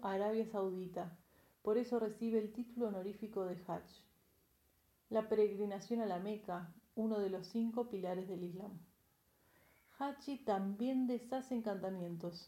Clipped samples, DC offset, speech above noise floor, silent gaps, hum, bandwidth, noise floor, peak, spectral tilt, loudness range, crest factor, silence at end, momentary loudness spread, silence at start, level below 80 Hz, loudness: under 0.1%; under 0.1%; 36 dB; none; none; 16.5 kHz; -75 dBFS; -22 dBFS; -7.5 dB/octave; 4 LU; 18 dB; 0 s; 10 LU; 0 s; -78 dBFS; -41 LUFS